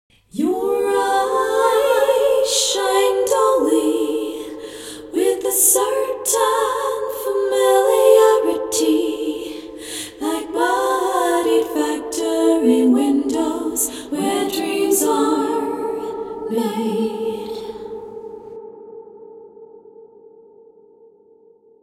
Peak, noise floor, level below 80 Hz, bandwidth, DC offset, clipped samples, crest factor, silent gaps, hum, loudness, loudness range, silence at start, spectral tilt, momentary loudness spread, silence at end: 0 dBFS; -51 dBFS; -58 dBFS; 16.5 kHz; under 0.1%; under 0.1%; 18 dB; none; none; -18 LUFS; 10 LU; 0.35 s; -2.5 dB/octave; 17 LU; 1.8 s